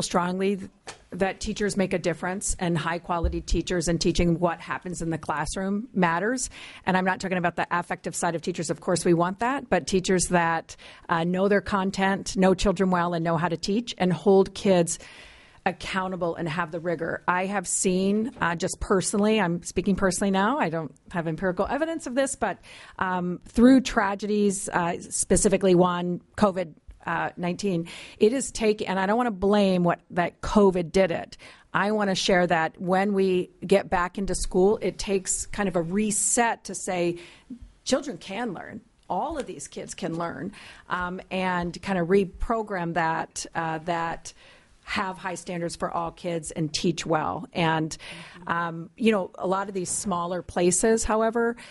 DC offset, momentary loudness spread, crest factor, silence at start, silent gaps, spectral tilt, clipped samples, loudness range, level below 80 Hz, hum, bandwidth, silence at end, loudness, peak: under 0.1%; 11 LU; 20 dB; 0 s; none; -4.5 dB/octave; under 0.1%; 6 LU; -44 dBFS; none; 11.5 kHz; 0 s; -25 LUFS; -6 dBFS